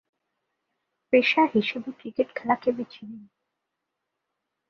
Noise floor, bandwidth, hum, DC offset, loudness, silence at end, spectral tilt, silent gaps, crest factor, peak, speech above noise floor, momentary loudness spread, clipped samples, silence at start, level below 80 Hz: -83 dBFS; 6.6 kHz; none; under 0.1%; -24 LUFS; 1.45 s; -6 dB/octave; none; 22 dB; -6 dBFS; 58 dB; 17 LU; under 0.1%; 1.1 s; -72 dBFS